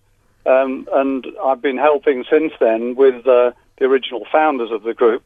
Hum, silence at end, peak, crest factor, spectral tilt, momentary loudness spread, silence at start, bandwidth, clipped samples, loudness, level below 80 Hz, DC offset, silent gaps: none; 0.05 s; 0 dBFS; 16 dB; -6.5 dB/octave; 7 LU; 0.45 s; 3.8 kHz; under 0.1%; -17 LUFS; -60 dBFS; under 0.1%; none